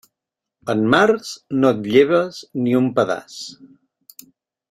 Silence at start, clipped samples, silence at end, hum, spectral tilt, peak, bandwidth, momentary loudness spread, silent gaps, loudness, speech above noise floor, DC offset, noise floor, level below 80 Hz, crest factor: 0.65 s; under 0.1%; 1.15 s; none; -5.5 dB/octave; -2 dBFS; 16 kHz; 18 LU; none; -18 LUFS; 66 dB; under 0.1%; -84 dBFS; -60 dBFS; 18 dB